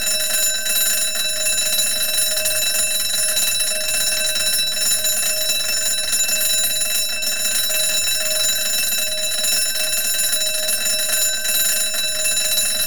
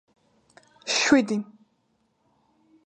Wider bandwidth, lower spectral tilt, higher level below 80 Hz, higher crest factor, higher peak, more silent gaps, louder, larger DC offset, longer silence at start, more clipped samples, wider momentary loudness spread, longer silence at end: first, 19.5 kHz vs 9.2 kHz; second, 2 dB/octave vs -3 dB/octave; first, -54 dBFS vs -66 dBFS; second, 14 dB vs 22 dB; about the same, -6 dBFS vs -6 dBFS; neither; first, -17 LUFS vs -22 LUFS; first, 4% vs under 0.1%; second, 0 s vs 0.85 s; neither; second, 2 LU vs 20 LU; second, 0 s vs 1.45 s